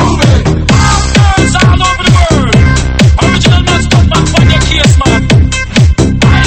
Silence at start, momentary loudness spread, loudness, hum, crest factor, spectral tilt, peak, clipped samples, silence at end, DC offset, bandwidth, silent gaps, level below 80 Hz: 0 s; 1 LU; -7 LUFS; none; 6 dB; -5 dB/octave; 0 dBFS; 2%; 0 s; under 0.1%; 8.8 kHz; none; -12 dBFS